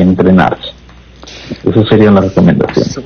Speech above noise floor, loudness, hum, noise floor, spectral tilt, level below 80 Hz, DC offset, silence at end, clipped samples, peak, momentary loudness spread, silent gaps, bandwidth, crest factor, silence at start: 27 dB; -9 LUFS; none; -35 dBFS; -7.5 dB/octave; -36 dBFS; under 0.1%; 0 s; 0.1%; 0 dBFS; 18 LU; none; 6.8 kHz; 10 dB; 0 s